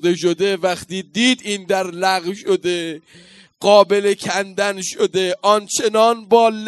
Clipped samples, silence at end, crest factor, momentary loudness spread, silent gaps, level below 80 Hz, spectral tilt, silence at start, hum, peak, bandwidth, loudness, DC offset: under 0.1%; 0 s; 18 dB; 8 LU; none; -64 dBFS; -3.5 dB/octave; 0 s; none; 0 dBFS; 12.5 kHz; -17 LUFS; under 0.1%